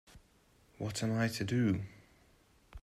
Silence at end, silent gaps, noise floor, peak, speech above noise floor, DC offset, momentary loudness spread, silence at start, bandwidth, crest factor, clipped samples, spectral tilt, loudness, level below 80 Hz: 0.05 s; none; -67 dBFS; -20 dBFS; 34 dB; under 0.1%; 10 LU; 0.15 s; 14.5 kHz; 16 dB; under 0.1%; -6 dB/octave; -35 LUFS; -62 dBFS